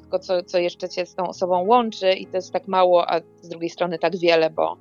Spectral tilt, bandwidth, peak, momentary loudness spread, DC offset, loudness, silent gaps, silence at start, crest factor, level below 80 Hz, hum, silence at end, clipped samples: -5 dB/octave; 7.2 kHz; -4 dBFS; 10 LU; under 0.1%; -21 LUFS; none; 0.1 s; 18 dB; -70 dBFS; none; 0.05 s; under 0.1%